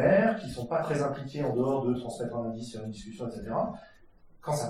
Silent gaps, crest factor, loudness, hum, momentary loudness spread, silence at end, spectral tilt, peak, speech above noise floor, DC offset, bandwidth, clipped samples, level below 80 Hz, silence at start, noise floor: none; 18 dB; -31 LUFS; none; 11 LU; 0 s; -6.5 dB/octave; -12 dBFS; 23 dB; under 0.1%; 15 kHz; under 0.1%; -56 dBFS; 0 s; -55 dBFS